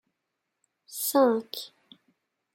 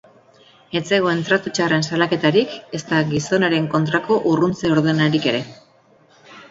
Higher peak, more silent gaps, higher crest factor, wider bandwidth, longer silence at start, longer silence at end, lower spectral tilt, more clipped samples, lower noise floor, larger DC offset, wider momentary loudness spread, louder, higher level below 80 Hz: second, -12 dBFS vs 0 dBFS; neither; about the same, 20 dB vs 20 dB; first, 16.5 kHz vs 8 kHz; first, 0.9 s vs 0.7 s; first, 0.9 s vs 0.05 s; second, -3 dB/octave vs -5.5 dB/octave; neither; first, -83 dBFS vs -54 dBFS; neither; first, 18 LU vs 9 LU; second, -25 LUFS vs -19 LUFS; second, -90 dBFS vs -56 dBFS